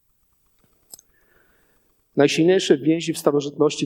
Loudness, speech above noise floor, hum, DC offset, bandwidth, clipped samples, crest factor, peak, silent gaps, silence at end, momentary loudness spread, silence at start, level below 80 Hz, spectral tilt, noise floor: -19 LUFS; 46 dB; none; under 0.1%; 18.5 kHz; under 0.1%; 20 dB; -2 dBFS; none; 0 s; 5 LU; 2.15 s; -68 dBFS; -5 dB/octave; -65 dBFS